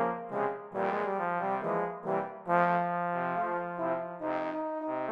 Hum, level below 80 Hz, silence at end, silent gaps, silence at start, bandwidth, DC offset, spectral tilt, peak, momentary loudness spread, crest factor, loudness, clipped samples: none; -80 dBFS; 0 s; none; 0 s; 7 kHz; under 0.1%; -8.5 dB/octave; -14 dBFS; 6 LU; 18 dB; -32 LUFS; under 0.1%